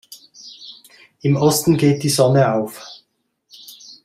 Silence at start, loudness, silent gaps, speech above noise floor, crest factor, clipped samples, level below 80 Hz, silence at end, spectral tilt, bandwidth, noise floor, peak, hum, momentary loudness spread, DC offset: 0.1 s; -17 LUFS; none; 52 dB; 18 dB; under 0.1%; -56 dBFS; 0.1 s; -5.5 dB/octave; 15.5 kHz; -68 dBFS; -2 dBFS; none; 23 LU; under 0.1%